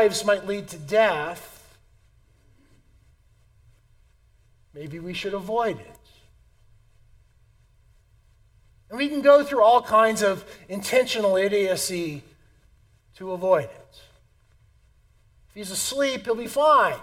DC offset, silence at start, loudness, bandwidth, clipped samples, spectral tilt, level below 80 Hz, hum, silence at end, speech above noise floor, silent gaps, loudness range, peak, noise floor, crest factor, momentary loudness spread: under 0.1%; 0 s; -22 LUFS; 17 kHz; under 0.1%; -3.5 dB/octave; -58 dBFS; none; 0 s; 37 dB; none; 14 LU; -4 dBFS; -59 dBFS; 22 dB; 20 LU